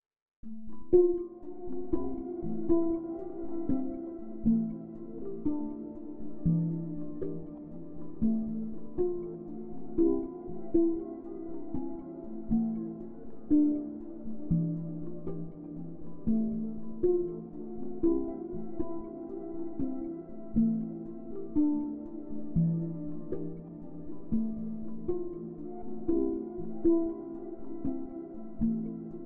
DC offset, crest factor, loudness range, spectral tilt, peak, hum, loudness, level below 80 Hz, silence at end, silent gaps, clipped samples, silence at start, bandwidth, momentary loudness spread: 1%; 20 dB; 3 LU; -14 dB/octave; -12 dBFS; none; -34 LUFS; -52 dBFS; 0 s; 0.22-0.43 s; under 0.1%; 0 s; 2.1 kHz; 14 LU